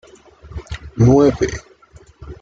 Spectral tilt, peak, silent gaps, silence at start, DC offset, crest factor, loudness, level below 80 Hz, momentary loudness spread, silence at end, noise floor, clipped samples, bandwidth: -7.5 dB/octave; -2 dBFS; none; 0.45 s; under 0.1%; 16 dB; -15 LUFS; -36 dBFS; 23 LU; 0.05 s; -46 dBFS; under 0.1%; 7.6 kHz